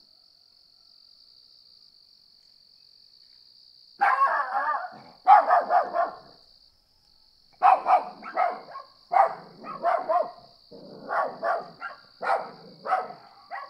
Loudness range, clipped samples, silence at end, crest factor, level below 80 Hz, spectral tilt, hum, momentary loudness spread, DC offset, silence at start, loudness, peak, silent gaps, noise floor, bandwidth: 7 LU; under 0.1%; 0 s; 24 dB; -76 dBFS; -4 dB/octave; none; 21 LU; under 0.1%; 4 s; -25 LUFS; -4 dBFS; none; -62 dBFS; 10 kHz